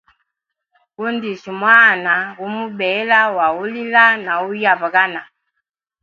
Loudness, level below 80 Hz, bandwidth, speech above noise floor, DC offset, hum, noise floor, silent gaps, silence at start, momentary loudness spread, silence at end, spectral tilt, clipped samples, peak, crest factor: -15 LUFS; -66 dBFS; 7.2 kHz; 63 dB; under 0.1%; none; -78 dBFS; none; 1 s; 15 LU; 0.8 s; -5 dB/octave; under 0.1%; 0 dBFS; 18 dB